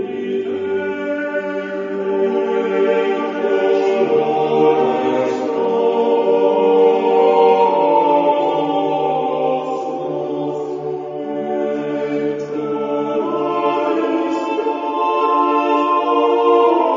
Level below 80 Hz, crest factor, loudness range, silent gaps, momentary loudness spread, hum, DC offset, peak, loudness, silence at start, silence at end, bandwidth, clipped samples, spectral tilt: -68 dBFS; 16 dB; 7 LU; none; 9 LU; none; under 0.1%; -2 dBFS; -17 LUFS; 0 s; 0 s; 7.4 kHz; under 0.1%; -6.5 dB/octave